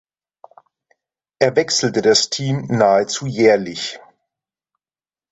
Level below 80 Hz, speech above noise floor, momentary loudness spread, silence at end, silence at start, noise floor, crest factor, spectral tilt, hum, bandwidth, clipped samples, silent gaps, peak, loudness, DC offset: -58 dBFS; over 74 dB; 11 LU; 1.35 s; 1.4 s; under -90 dBFS; 18 dB; -4 dB/octave; none; 8.2 kHz; under 0.1%; none; -2 dBFS; -17 LUFS; under 0.1%